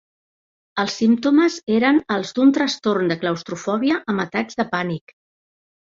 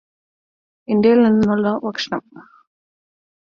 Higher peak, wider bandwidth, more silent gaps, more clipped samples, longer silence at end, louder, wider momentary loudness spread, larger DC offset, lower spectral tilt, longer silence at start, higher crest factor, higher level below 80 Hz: about the same, -4 dBFS vs -4 dBFS; about the same, 7.6 kHz vs 7 kHz; neither; neither; about the same, 0.95 s vs 1 s; second, -20 LUFS vs -17 LUFS; second, 8 LU vs 12 LU; neither; second, -5 dB/octave vs -7 dB/octave; second, 0.75 s vs 0.9 s; about the same, 16 dB vs 16 dB; second, -64 dBFS vs -56 dBFS